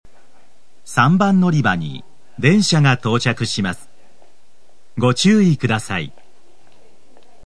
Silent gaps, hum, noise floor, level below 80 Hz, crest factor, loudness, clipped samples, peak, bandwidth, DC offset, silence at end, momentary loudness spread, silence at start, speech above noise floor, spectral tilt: none; none; -58 dBFS; -58 dBFS; 18 dB; -16 LUFS; under 0.1%; 0 dBFS; 11 kHz; 2%; 1.35 s; 14 LU; 0.9 s; 43 dB; -5.5 dB/octave